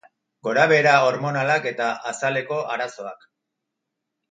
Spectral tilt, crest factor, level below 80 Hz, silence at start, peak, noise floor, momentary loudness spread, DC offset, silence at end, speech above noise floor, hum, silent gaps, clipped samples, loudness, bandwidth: -4.5 dB/octave; 20 dB; -74 dBFS; 0.45 s; -2 dBFS; -81 dBFS; 15 LU; under 0.1%; 1.2 s; 60 dB; none; none; under 0.1%; -21 LUFS; 9.4 kHz